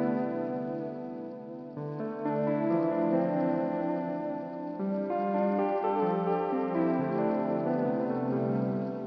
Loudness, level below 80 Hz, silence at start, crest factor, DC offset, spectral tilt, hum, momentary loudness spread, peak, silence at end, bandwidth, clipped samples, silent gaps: -30 LUFS; -72 dBFS; 0 s; 14 dB; under 0.1%; -10.5 dB/octave; none; 10 LU; -16 dBFS; 0 s; 5.8 kHz; under 0.1%; none